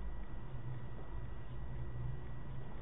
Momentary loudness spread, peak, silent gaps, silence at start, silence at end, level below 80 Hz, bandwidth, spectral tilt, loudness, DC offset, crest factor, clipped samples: 4 LU; -30 dBFS; none; 0 s; 0 s; -48 dBFS; 3.9 kHz; -7 dB/octave; -48 LUFS; 0.8%; 14 dB; under 0.1%